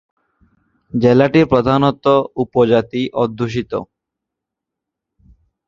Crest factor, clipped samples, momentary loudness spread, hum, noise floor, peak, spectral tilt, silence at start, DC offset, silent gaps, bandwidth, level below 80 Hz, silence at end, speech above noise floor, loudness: 16 dB; under 0.1%; 10 LU; none; -82 dBFS; -2 dBFS; -8 dB/octave; 0.95 s; under 0.1%; none; 7.4 kHz; -48 dBFS; 1.85 s; 67 dB; -15 LUFS